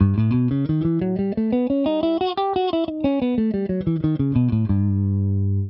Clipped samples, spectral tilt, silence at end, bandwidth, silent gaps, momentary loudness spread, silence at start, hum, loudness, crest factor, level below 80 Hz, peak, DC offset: under 0.1%; -11.5 dB/octave; 0 s; 5.4 kHz; none; 3 LU; 0 s; none; -21 LUFS; 16 dB; -44 dBFS; -4 dBFS; under 0.1%